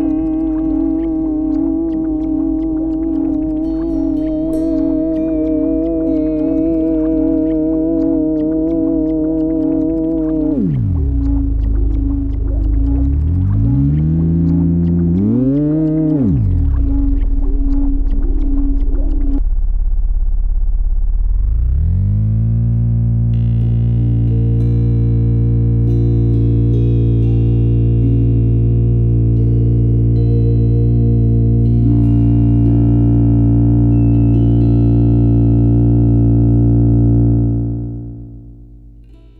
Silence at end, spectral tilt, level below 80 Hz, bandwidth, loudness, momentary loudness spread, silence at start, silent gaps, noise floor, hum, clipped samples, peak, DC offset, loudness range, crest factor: 0.25 s; -13 dB/octave; -18 dBFS; 2.8 kHz; -15 LUFS; 7 LU; 0 s; none; -39 dBFS; 50 Hz at -35 dBFS; under 0.1%; -2 dBFS; under 0.1%; 6 LU; 10 dB